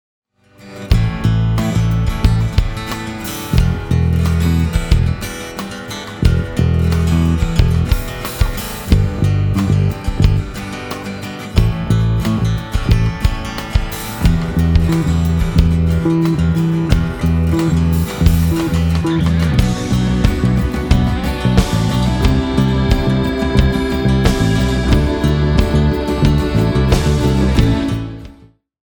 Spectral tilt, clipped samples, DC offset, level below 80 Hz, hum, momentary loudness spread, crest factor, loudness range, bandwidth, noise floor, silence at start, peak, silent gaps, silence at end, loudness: -6.5 dB/octave; under 0.1%; under 0.1%; -20 dBFS; none; 9 LU; 14 dB; 3 LU; over 20 kHz; -45 dBFS; 0.65 s; 0 dBFS; none; 0.6 s; -16 LUFS